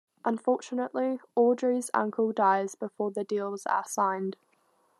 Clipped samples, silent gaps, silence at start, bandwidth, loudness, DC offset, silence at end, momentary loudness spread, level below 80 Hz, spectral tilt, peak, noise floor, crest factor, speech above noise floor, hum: under 0.1%; none; 0.25 s; 13 kHz; -29 LUFS; under 0.1%; 0.65 s; 8 LU; -90 dBFS; -5 dB/octave; -10 dBFS; -69 dBFS; 18 dB; 41 dB; none